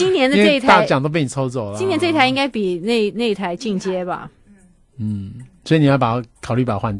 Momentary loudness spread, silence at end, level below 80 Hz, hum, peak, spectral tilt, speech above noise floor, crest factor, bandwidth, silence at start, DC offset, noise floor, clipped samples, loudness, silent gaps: 13 LU; 0 s; -50 dBFS; none; 0 dBFS; -6 dB/octave; 32 dB; 18 dB; 11.5 kHz; 0 s; under 0.1%; -50 dBFS; under 0.1%; -17 LUFS; none